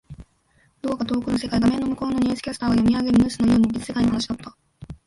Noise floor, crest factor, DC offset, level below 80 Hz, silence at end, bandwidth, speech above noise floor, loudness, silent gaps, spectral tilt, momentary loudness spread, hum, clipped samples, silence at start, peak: -62 dBFS; 14 dB; under 0.1%; -44 dBFS; 0.1 s; 11.5 kHz; 41 dB; -22 LUFS; none; -6 dB/octave; 11 LU; none; under 0.1%; 0.1 s; -8 dBFS